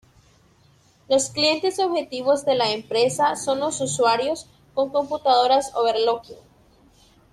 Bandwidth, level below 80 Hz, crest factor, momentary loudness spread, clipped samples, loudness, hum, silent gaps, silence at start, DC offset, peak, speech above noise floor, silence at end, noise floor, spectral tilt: 13.5 kHz; -62 dBFS; 18 dB; 6 LU; under 0.1%; -22 LUFS; none; none; 1.1 s; under 0.1%; -6 dBFS; 36 dB; 0.95 s; -57 dBFS; -3 dB/octave